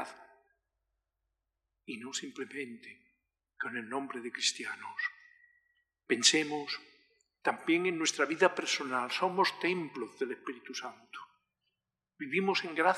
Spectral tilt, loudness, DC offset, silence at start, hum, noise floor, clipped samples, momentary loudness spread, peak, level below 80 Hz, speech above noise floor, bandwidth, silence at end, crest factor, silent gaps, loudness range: -2 dB/octave; -32 LUFS; under 0.1%; 0 s; none; -88 dBFS; under 0.1%; 16 LU; -10 dBFS; -90 dBFS; 55 dB; 13.5 kHz; 0 s; 26 dB; none; 12 LU